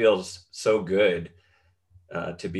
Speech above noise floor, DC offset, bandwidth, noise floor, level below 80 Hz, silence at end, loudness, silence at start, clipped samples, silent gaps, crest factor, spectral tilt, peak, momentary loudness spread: 40 dB; under 0.1%; 12 kHz; -65 dBFS; -60 dBFS; 0 s; -25 LUFS; 0 s; under 0.1%; none; 18 dB; -5 dB/octave; -8 dBFS; 15 LU